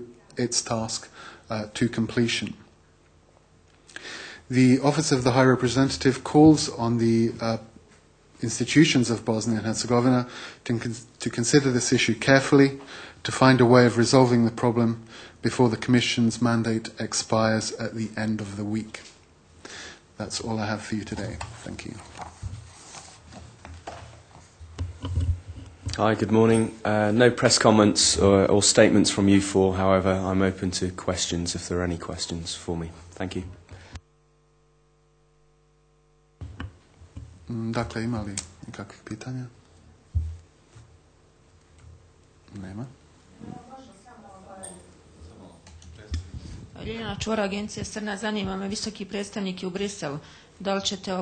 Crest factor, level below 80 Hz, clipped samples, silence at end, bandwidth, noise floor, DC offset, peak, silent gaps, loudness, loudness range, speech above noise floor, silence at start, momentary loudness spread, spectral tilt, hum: 22 dB; -48 dBFS; under 0.1%; 0 s; 9.4 kHz; -62 dBFS; under 0.1%; -2 dBFS; none; -23 LUFS; 21 LU; 39 dB; 0 s; 23 LU; -4.5 dB/octave; none